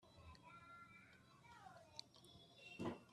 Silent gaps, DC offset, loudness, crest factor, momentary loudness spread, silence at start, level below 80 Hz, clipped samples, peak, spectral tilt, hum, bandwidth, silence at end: none; under 0.1%; -59 LUFS; 26 dB; 14 LU; 0 s; -80 dBFS; under 0.1%; -32 dBFS; -5 dB/octave; none; 13 kHz; 0 s